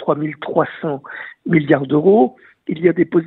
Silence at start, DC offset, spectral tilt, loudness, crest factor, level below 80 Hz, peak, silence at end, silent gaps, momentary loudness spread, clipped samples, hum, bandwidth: 0 s; under 0.1%; -10.5 dB/octave; -17 LUFS; 16 dB; -60 dBFS; 0 dBFS; 0 s; none; 15 LU; under 0.1%; none; 4.1 kHz